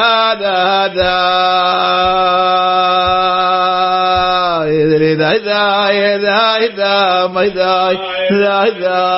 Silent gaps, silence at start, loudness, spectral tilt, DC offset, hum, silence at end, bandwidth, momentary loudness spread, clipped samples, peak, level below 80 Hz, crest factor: none; 0 s; -12 LUFS; -8 dB/octave; under 0.1%; none; 0 s; 5.8 kHz; 2 LU; under 0.1%; 0 dBFS; -42 dBFS; 12 dB